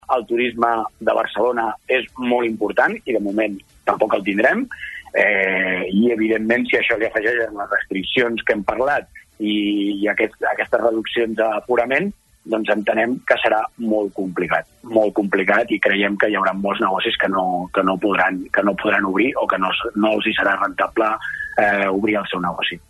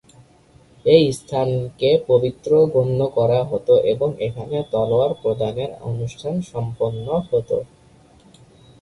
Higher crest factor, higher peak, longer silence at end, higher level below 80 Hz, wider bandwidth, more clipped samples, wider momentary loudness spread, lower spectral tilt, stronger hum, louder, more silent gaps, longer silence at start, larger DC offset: about the same, 18 dB vs 18 dB; about the same, -2 dBFS vs -2 dBFS; second, 0.1 s vs 1.15 s; about the same, -54 dBFS vs -52 dBFS; about the same, 12 kHz vs 11.5 kHz; neither; second, 5 LU vs 11 LU; about the same, -6 dB/octave vs -7 dB/octave; neither; about the same, -19 LUFS vs -20 LUFS; neither; second, 0.1 s vs 0.85 s; neither